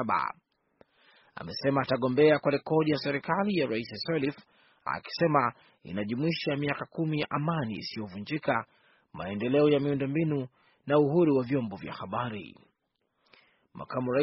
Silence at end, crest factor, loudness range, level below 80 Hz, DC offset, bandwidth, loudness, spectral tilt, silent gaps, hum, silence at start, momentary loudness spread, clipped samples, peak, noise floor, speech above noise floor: 0 s; 20 dB; 4 LU; -66 dBFS; under 0.1%; 5.8 kHz; -29 LUFS; -5.5 dB/octave; none; none; 0 s; 16 LU; under 0.1%; -10 dBFS; -78 dBFS; 50 dB